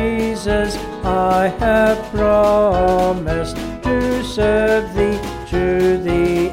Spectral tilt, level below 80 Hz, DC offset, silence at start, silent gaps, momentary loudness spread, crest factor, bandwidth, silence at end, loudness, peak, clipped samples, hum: -6 dB/octave; -30 dBFS; under 0.1%; 0 s; none; 8 LU; 12 dB; 16.5 kHz; 0 s; -17 LUFS; -4 dBFS; under 0.1%; none